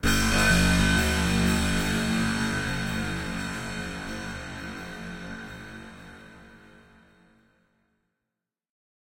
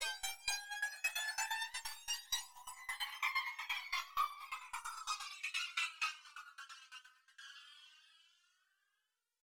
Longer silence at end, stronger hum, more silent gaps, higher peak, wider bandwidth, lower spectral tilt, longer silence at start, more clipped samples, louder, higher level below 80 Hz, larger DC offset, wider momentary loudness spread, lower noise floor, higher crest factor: first, 2.45 s vs 1.15 s; neither; neither; first, -10 dBFS vs -24 dBFS; second, 16.5 kHz vs over 20 kHz; first, -4 dB/octave vs 4.5 dB/octave; about the same, 0 s vs 0 s; neither; first, -26 LUFS vs -40 LUFS; first, -36 dBFS vs -76 dBFS; neither; first, 20 LU vs 17 LU; about the same, -87 dBFS vs -87 dBFS; about the same, 18 dB vs 22 dB